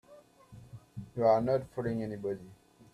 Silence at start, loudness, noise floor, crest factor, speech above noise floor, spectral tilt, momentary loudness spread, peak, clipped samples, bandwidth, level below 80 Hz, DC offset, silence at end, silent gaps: 0.1 s; -32 LUFS; -58 dBFS; 20 dB; 27 dB; -8.5 dB/octave; 22 LU; -14 dBFS; under 0.1%; 13 kHz; -62 dBFS; under 0.1%; 0.4 s; none